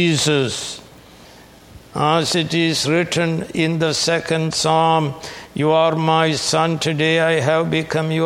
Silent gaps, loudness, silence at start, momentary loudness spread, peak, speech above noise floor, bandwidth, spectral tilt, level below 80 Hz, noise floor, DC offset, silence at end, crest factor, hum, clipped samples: none; -18 LUFS; 0 s; 7 LU; 0 dBFS; 26 dB; 15 kHz; -4.5 dB/octave; -52 dBFS; -43 dBFS; under 0.1%; 0 s; 18 dB; none; under 0.1%